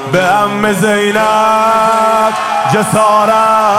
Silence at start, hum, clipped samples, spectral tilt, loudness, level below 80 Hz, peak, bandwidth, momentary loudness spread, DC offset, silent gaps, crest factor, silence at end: 0 s; none; under 0.1%; -4.5 dB/octave; -10 LUFS; -48 dBFS; 0 dBFS; 16.5 kHz; 3 LU; 0.4%; none; 10 dB; 0 s